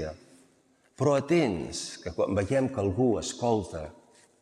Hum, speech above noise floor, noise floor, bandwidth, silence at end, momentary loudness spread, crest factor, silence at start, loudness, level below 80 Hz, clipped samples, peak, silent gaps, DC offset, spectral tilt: none; 38 dB; -65 dBFS; 12 kHz; 0.5 s; 13 LU; 18 dB; 0 s; -28 LUFS; -56 dBFS; under 0.1%; -12 dBFS; none; under 0.1%; -6 dB/octave